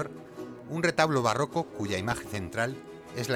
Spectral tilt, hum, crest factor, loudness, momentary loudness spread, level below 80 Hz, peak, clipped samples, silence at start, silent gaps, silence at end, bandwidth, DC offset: -5 dB/octave; none; 20 dB; -29 LUFS; 18 LU; -58 dBFS; -10 dBFS; under 0.1%; 0 s; none; 0 s; 19 kHz; under 0.1%